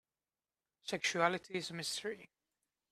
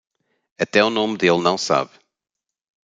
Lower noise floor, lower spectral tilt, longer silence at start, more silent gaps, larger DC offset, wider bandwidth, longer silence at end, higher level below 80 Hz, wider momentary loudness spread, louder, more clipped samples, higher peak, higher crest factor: first, under -90 dBFS vs -85 dBFS; about the same, -3 dB/octave vs -4 dB/octave; first, 0.85 s vs 0.6 s; neither; neither; first, 15.5 kHz vs 9.4 kHz; second, 0.65 s vs 1.05 s; second, -82 dBFS vs -64 dBFS; first, 14 LU vs 7 LU; second, -37 LUFS vs -19 LUFS; neither; second, -16 dBFS vs -2 dBFS; first, 26 dB vs 20 dB